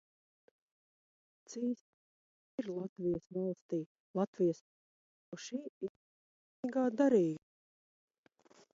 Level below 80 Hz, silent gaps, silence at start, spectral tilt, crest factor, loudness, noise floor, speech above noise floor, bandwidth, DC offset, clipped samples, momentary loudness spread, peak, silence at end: -78 dBFS; 1.81-2.58 s, 2.89-2.96 s, 3.62-3.69 s, 3.86-4.14 s, 4.27-4.33 s, 4.61-5.32 s, 5.69-5.81 s, 5.89-6.63 s; 1.5 s; -7.5 dB/octave; 20 dB; -37 LUFS; -69 dBFS; 33 dB; 7.6 kHz; under 0.1%; under 0.1%; 17 LU; -18 dBFS; 1.35 s